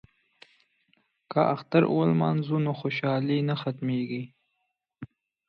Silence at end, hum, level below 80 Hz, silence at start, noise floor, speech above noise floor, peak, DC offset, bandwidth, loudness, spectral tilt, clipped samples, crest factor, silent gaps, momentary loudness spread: 0.45 s; none; -70 dBFS; 1.3 s; -79 dBFS; 54 dB; -8 dBFS; under 0.1%; 5.6 kHz; -27 LUFS; -9.5 dB/octave; under 0.1%; 20 dB; none; 22 LU